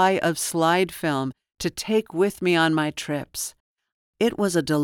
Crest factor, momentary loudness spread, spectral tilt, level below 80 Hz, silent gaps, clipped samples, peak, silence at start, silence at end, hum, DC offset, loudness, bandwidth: 16 dB; 10 LU; -4.5 dB/octave; -58 dBFS; 3.60-3.76 s, 3.92-4.13 s; under 0.1%; -8 dBFS; 0 s; 0 s; none; under 0.1%; -24 LUFS; 19.5 kHz